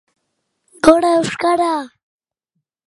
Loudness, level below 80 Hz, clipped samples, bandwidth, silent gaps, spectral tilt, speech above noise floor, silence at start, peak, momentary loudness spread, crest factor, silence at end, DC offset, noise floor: -15 LUFS; -50 dBFS; under 0.1%; 11.5 kHz; none; -4.5 dB/octave; 61 dB; 0.85 s; 0 dBFS; 11 LU; 18 dB; 1 s; under 0.1%; -75 dBFS